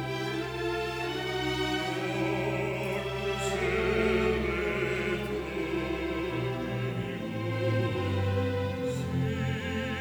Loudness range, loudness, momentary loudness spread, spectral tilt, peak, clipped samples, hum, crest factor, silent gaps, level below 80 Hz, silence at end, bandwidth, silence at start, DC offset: 2 LU; -30 LUFS; 5 LU; -6 dB/octave; -14 dBFS; under 0.1%; none; 16 dB; none; -46 dBFS; 0 s; over 20 kHz; 0 s; under 0.1%